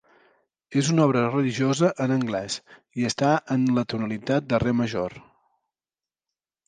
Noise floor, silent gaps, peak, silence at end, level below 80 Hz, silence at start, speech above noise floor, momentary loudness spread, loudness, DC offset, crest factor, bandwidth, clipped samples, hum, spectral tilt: under -90 dBFS; none; -6 dBFS; 1.45 s; -56 dBFS; 0.7 s; over 67 dB; 9 LU; -24 LUFS; under 0.1%; 18 dB; 9.8 kHz; under 0.1%; none; -6 dB/octave